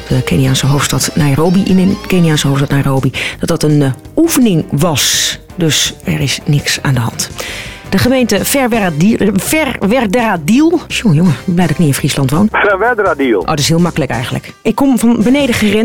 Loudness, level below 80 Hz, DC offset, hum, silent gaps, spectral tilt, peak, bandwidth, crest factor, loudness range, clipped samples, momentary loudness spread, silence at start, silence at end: -12 LUFS; -34 dBFS; under 0.1%; none; none; -5 dB/octave; 0 dBFS; 18 kHz; 10 dB; 2 LU; under 0.1%; 6 LU; 0 s; 0 s